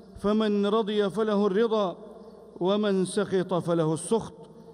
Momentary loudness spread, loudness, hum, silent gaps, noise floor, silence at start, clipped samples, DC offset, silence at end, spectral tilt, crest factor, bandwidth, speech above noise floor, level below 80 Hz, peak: 7 LU; -26 LUFS; none; none; -47 dBFS; 0.1 s; under 0.1%; under 0.1%; 0 s; -6 dB/octave; 14 dB; 11.5 kHz; 21 dB; -60 dBFS; -12 dBFS